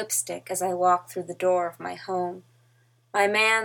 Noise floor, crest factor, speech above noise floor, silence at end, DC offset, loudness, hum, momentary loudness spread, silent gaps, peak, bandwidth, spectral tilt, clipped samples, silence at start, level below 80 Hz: -63 dBFS; 20 dB; 37 dB; 0 s; under 0.1%; -26 LUFS; none; 13 LU; none; -6 dBFS; 19.5 kHz; -2.5 dB/octave; under 0.1%; 0 s; -80 dBFS